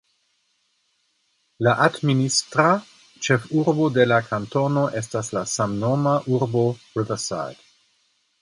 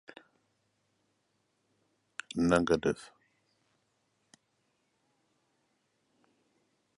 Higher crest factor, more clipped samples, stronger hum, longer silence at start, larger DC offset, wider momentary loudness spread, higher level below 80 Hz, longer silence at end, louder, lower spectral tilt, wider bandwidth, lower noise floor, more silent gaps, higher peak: second, 20 dB vs 28 dB; neither; neither; second, 1.6 s vs 2.35 s; neither; second, 8 LU vs 19 LU; about the same, -60 dBFS vs -62 dBFS; second, 0.9 s vs 3.9 s; first, -22 LUFS vs -30 LUFS; about the same, -5 dB/octave vs -6 dB/octave; about the same, 11.5 kHz vs 11.5 kHz; second, -69 dBFS vs -77 dBFS; neither; first, -2 dBFS vs -10 dBFS